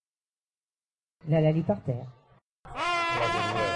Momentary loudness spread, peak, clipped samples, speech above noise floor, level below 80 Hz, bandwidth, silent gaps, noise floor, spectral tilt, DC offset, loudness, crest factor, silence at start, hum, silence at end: 17 LU; -14 dBFS; under 0.1%; over 63 dB; -58 dBFS; 11 kHz; 2.42-2.64 s; under -90 dBFS; -6 dB/octave; under 0.1%; -27 LUFS; 16 dB; 1.25 s; none; 0 s